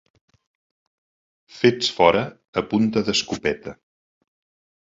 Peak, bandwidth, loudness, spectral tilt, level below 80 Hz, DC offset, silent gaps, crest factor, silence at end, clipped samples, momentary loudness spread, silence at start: -2 dBFS; 7.8 kHz; -21 LUFS; -4.5 dB/octave; -54 dBFS; under 0.1%; 2.48-2.53 s; 22 dB; 1.15 s; under 0.1%; 10 LU; 1.55 s